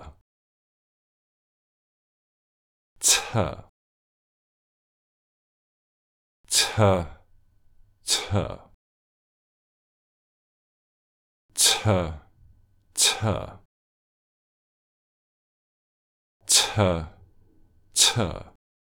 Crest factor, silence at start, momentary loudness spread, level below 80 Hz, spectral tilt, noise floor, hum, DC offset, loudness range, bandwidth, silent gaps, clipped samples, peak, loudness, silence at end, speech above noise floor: 26 dB; 0 s; 20 LU; -52 dBFS; -2.5 dB/octave; -58 dBFS; none; under 0.1%; 8 LU; over 20 kHz; 0.21-2.96 s, 3.69-6.44 s, 8.74-11.49 s, 13.65-16.40 s; under 0.1%; -2 dBFS; -22 LUFS; 0.35 s; 33 dB